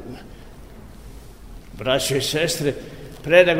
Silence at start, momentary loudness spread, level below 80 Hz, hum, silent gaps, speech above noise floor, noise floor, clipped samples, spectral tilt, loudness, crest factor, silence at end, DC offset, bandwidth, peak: 0 s; 25 LU; -44 dBFS; none; none; 23 dB; -41 dBFS; under 0.1%; -3.5 dB/octave; -20 LUFS; 22 dB; 0 s; 0.4%; 16 kHz; 0 dBFS